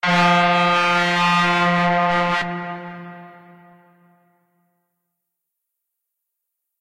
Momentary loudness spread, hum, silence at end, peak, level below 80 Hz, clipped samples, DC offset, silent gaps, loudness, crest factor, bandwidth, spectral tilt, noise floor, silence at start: 18 LU; none; 3.5 s; -4 dBFS; -58 dBFS; under 0.1%; under 0.1%; none; -17 LUFS; 16 dB; 11.5 kHz; -5 dB/octave; -79 dBFS; 0.05 s